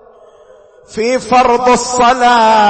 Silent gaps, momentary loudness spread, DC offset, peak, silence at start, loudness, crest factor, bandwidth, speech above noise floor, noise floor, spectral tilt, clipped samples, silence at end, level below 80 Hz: none; 9 LU; under 0.1%; -2 dBFS; 0.9 s; -10 LUFS; 10 dB; 8.8 kHz; 32 dB; -42 dBFS; -3 dB/octave; under 0.1%; 0 s; -42 dBFS